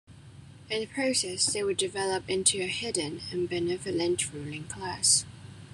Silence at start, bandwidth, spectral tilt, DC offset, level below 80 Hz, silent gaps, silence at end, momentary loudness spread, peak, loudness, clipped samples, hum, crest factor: 0.1 s; 13 kHz; -2 dB/octave; under 0.1%; -62 dBFS; none; 0 s; 13 LU; -8 dBFS; -28 LUFS; under 0.1%; none; 22 dB